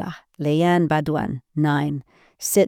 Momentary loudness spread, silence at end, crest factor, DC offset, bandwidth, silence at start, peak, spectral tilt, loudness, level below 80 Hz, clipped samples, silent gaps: 11 LU; 0 s; 16 dB; under 0.1%; 19.5 kHz; 0 s; -6 dBFS; -5.5 dB/octave; -22 LUFS; -54 dBFS; under 0.1%; none